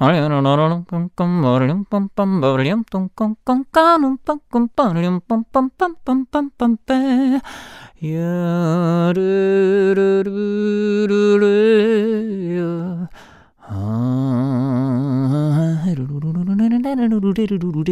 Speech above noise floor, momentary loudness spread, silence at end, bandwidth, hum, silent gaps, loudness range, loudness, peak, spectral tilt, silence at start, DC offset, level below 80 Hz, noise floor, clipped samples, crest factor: 28 dB; 9 LU; 0 s; 11.5 kHz; none; none; 4 LU; -17 LUFS; 0 dBFS; -8.5 dB/octave; 0 s; under 0.1%; -52 dBFS; -45 dBFS; under 0.1%; 16 dB